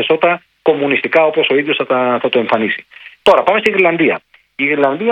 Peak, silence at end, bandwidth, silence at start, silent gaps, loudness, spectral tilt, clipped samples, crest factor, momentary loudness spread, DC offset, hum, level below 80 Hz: 0 dBFS; 0 s; 9.8 kHz; 0 s; none; -14 LUFS; -5.5 dB/octave; 0.2%; 14 dB; 6 LU; under 0.1%; none; -58 dBFS